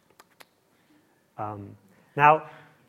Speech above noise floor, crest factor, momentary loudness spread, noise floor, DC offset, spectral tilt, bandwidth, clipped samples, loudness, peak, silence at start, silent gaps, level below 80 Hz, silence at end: 41 dB; 24 dB; 26 LU; -64 dBFS; under 0.1%; -6.5 dB/octave; 14.5 kHz; under 0.1%; -23 LUFS; -4 dBFS; 1.4 s; none; -70 dBFS; 0.4 s